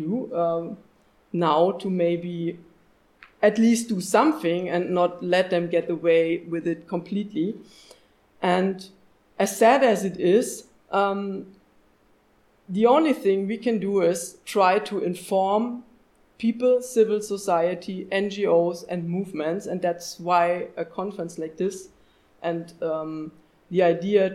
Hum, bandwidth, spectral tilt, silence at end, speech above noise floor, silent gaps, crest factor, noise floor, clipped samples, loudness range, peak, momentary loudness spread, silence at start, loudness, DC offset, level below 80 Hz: none; 15 kHz; -5.5 dB/octave; 0 s; 38 dB; none; 18 dB; -61 dBFS; under 0.1%; 5 LU; -6 dBFS; 12 LU; 0 s; -24 LUFS; under 0.1%; -68 dBFS